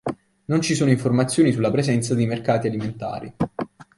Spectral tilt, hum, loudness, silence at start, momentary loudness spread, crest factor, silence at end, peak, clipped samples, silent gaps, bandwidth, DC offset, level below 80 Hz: -6 dB/octave; none; -22 LUFS; 0.05 s; 12 LU; 16 dB; 0.15 s; -4 dBFS; under 0.1%; none; 11.5 kHz; under 0.1%; -54 dBFS